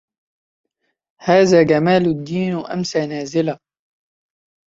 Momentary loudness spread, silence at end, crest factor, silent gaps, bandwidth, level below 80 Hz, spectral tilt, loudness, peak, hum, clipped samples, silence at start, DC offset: 11 LU; 1.1 s; 18 dB; none; 7.8 kHz; -56 dBFS; -6 dB/octave; -17 LUFS; 0 dBFS; none; under 0.1%; 1.2 s; under 0.1%